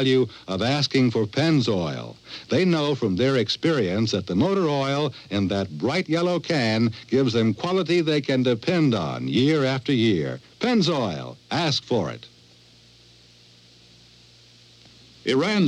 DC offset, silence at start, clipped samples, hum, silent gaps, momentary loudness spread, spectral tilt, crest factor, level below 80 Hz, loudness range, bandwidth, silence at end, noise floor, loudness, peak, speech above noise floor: under 0.1%; 0 s; under 0.1%; none; none; 6 LU; -6 dB/octave; 14 dB; -62 dBFS; 8 LU; 10.5 kHz; 0 s; -53 dBFS; -23 LUFS; -10 dBFS; 30 dB